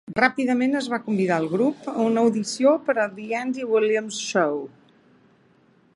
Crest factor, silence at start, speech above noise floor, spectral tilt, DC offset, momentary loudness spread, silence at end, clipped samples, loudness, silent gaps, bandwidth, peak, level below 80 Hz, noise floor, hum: 22 dB; 0.1 s; 36 dB; -5 dB/octave; under 0.1%; 6 LU; 1.3 s; under 0.1%; -23 LUFS; none; 11.5 kHz; -2 dBFS; -68 dBFS; -59 dBFS; none